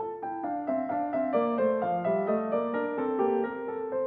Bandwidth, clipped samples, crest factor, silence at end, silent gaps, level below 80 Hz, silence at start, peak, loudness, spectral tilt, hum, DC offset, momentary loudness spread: 4.5 kHz; under 0.1%; 14 dB; 0 s; none; -70 dBFS; 0 s; -14 dBFS; -29 LUFS; -10 dB/octave; none; under 0.1%; 6 LU